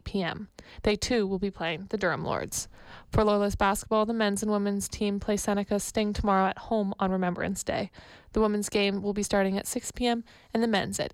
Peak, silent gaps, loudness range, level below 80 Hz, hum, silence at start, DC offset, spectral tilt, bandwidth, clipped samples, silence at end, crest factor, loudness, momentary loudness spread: -14 dBFS; none; 2 LU; -46 dBFS; none; 0.05 s; under 0.1%; -4.5 dB/octave; 16 kHz; under 0.1%; 0.05 s; 14 dB; -28 LUFS; 8 LU